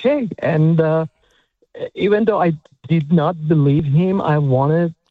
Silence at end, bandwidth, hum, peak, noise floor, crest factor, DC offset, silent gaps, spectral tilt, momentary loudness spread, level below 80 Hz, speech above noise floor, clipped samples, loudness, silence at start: 0.2 s; 4.5 kHz; none; -2 dBFS; -60 dBFS; 14 dB; under 0.1%; none; -10.5 dB/octave; 6 LU; -50 dBFS; 45 dB; under 0.1%; -17 LUFS; 0 s